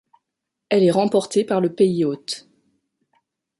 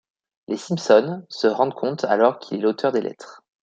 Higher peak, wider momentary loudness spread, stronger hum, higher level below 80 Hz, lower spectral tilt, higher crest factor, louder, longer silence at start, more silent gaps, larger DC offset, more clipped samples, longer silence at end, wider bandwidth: second, -6 dBFS vs -2 dBFS; about the same, 12 LU vs 13 LU; neither; about the same, -68 dBFS vs -72 dBFS; about the same, -6 dB/octave vs -5.5 dB/octave; about the same, 16 dB vs 18 dB; about the same, -20 LUFS vs -21 LUFS; first, 0.7 s vs 0.5 s; neither; neither; neither; first, 1.2 s vs 0.3 s; first, 11.5 kHz vs 8.8 kHz